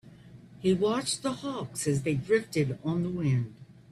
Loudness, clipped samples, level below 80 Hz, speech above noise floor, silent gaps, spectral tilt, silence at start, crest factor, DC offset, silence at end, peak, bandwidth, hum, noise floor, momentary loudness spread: -29 LUFS; under 0.1%; -60 dBFS; 22 dB; none; -5.5 dB/octave; 0.05 s; 18 dB; under 0.1%; 0.2 s; -12 dBFS; 13.5 kHz; none; -51 dBFS; 6 LU